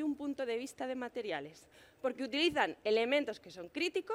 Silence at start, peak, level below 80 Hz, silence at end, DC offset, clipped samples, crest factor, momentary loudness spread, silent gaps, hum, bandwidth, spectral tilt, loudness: 0 s; -16 dBFS; -74 dBFS; 0 s; under 0.1%; under 0.1%; 20 dB; 11 LU; none; none; 16 kHz; -3.5 dB/octave; -36 LUFS